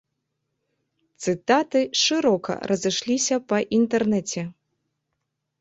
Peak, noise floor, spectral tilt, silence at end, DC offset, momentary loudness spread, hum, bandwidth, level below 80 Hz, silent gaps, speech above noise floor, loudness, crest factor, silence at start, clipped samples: -6 dBFS; -79 dBFS; -3.5 dB/octave; 1.1 s; under 0.1%; 9 LU; none; 8.4 kHz; -66 dBFS; none; 57 dB; -22 LUFS; 18 dB; 1.2 s; under 0.1%